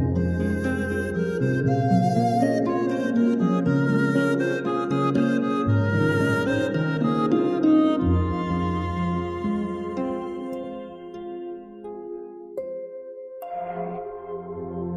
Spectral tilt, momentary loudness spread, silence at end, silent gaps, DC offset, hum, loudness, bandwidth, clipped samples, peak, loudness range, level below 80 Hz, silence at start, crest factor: -8 dB/octave; 15 LU; 0 s; none; under 0.1%; none; -24 LUFS; 12.5 kHz; under 0.1%; -8 dBFS; 13 LU; -44 dBFS; 0 s; 14 dB